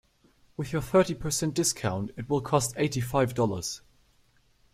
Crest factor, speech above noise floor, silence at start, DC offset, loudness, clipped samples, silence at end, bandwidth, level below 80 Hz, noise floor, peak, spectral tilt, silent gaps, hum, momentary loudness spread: 20 dB; 37 dB; 0.6 s; under 0.1%; -28 LUFS; under 0.1%; 0.95 s; 16 kHz; -54 dBFS; -64 dBFS; -10 dBFS; -4.5 dB/octave; none; none; 11 LU